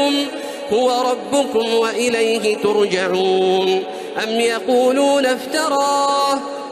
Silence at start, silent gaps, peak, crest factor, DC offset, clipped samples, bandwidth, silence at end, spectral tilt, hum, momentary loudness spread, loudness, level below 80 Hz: 0 s; none; -6 dBFS; 12 dB; under 0.1%; under 0.1%; 14.5 kHz; 0 s; -3 dB/octave; none; 5 LU; -17 LUFS; -64 dBFS